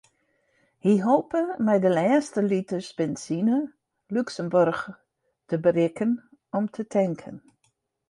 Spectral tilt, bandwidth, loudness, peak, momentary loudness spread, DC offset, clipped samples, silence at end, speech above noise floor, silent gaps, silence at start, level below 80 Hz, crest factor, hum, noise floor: -7 dB/octave; 11 kHz; -25 LUFS; -8 dBFS; 11 LU; under 0.1%; under 0.1%; 0.7 s; 48 dB; none; 0.85 s; -68 dBFS; 16 dB; none; -72 dBFS